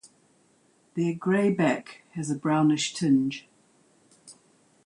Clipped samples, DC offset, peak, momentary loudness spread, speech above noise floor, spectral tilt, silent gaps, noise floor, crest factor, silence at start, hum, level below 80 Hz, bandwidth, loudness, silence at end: under 0.1%; under 0.1%; -12 dBFS; 13 LU; 39 dB; -5.5 dB/octave; none; -64 dBFS; 16 dB; 0.95 s; none; -72 dBFS; 11 kHz; -26 LUFS; 0.55 s